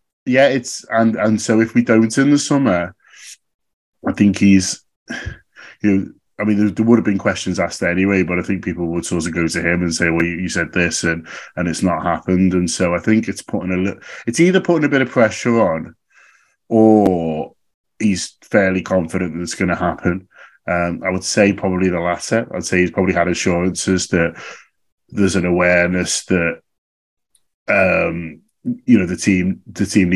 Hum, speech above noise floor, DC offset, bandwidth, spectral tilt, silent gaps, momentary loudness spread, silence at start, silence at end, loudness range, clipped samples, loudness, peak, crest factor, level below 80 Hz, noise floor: none; 37 dB; under 0.1%; 12 kHz; -5 dB/octave; 3.54-3.59 s, 3.73-3.93 s, 4.96-5.06 s, 17.74-17.84 s, 24.92-24.98 s, 26.78-27.17 s, 27.54-27.66 s; 12 LU; 0.25 s; 0 s; 3 LU; under 0.1%; -17 LUFS; 0 dBFS; 18 dB; -40 dBFS; -53 dBFS